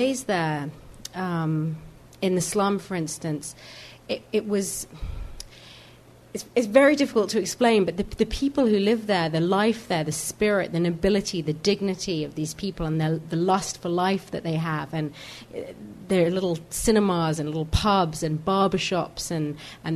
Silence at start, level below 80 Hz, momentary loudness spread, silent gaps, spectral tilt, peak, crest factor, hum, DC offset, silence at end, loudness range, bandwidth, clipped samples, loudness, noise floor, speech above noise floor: 0 s; -44 dBFS; 16 LU; none; -5 dB/octave; -4 dBFS; 20 dB; none; under 0.1%; 0 s; 6 LU; 13.5 kHz; under 0.1%; -25 LUFS; -50 dBFS; 26 dB